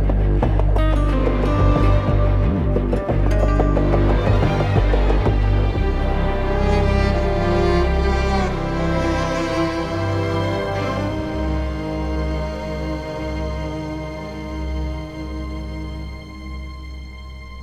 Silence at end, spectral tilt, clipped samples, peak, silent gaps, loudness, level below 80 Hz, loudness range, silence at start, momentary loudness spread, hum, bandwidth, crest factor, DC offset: 0 s; -7.5 dB/octave; under 0.1%; -4 dBFS; none; -21 LUFS; -22 dBFS; 9 LU; 0 s; 12 LU; none; 7.8 kHz; 14 dB; under 0.1%